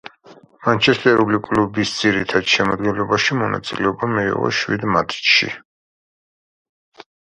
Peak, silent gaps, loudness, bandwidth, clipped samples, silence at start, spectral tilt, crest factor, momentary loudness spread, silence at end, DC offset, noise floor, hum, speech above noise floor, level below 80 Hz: 0 dBFS; 5.65-6.92 s; -17 LUFS; 10.5 kHz; under 0.1%; 0.05 s; -4.5 dB/octave; 20 dB; 7 LU; 0.35 s; under 0.1%; -47 dBFS; none; 29 dB; -52 dBFS